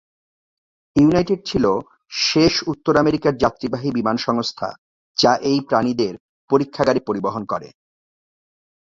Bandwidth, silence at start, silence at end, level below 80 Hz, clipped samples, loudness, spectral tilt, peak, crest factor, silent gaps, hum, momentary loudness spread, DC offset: 7.8 kHz; 0.95 s; 1.15 s; -48 dBFS; under 0.1%; -19 LUFS; -5 dB/octave; -2 dBFS; 20 dB; 4.78-5.15 s, 6.20-6.48 s; none; 10 LU; under 0.1%